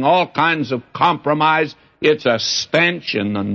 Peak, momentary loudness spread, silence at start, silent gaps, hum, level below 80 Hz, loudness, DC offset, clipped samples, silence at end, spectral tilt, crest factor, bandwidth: -2 dBFS; 6 LU; 0 s; none; none; -60 dBFS; -17 LUFS; under 0.1%; under 0.1%; 0 s; -4 dB/octave; 16 dB; 7.8 kHz